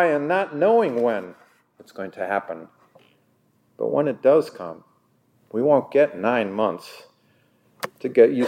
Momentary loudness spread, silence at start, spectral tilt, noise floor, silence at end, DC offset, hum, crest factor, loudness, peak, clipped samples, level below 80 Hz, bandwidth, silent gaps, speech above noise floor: 18 LU; 0 s; -6.5 dB/octave; -64 dBFS; 0 s; under 0.1%; none; 20 dB; -21 LUFS; -2 dBFS; under 0.1%; -78 dBFS; 16 kHz; none; 43 dB